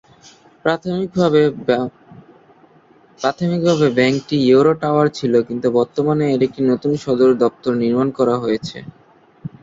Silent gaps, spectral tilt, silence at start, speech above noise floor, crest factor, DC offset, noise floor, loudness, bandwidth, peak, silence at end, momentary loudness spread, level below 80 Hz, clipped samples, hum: none; -7 dB/octave; 0.65 s; 34 dB; 16 dB; under 0.1%; -50 dBFS; -17 LUFS; 7.8 kHz; -2 dBFS; 0.15 s; 9 LU; -56 dBFS; under 0.1%; none